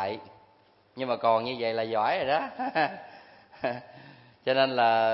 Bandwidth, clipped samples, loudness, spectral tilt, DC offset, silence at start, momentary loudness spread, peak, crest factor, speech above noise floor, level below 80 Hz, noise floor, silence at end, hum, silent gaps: 5.8 kHz; under 0.1%; -28 LUFS; -8.5 dB/octave; under 0.1%; 0 s; 15 LU; -10 dBFS; 20 dB; 35 dB; -72 dBFS; -62 dBFS; 0 s; none; none